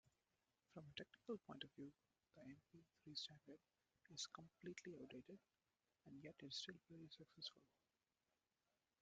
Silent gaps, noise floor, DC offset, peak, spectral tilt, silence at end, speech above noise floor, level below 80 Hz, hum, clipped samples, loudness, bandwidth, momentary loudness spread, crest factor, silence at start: none; under -90 dBFS; under 0.1%; -38 dBFS; -3 dB/octave; 1.35 s; over 31 dB; under -90 dBFS; none; under 0.1%; -58 LUFS; 7.6 kHz; 13 LU; 24 dB; 0.05 s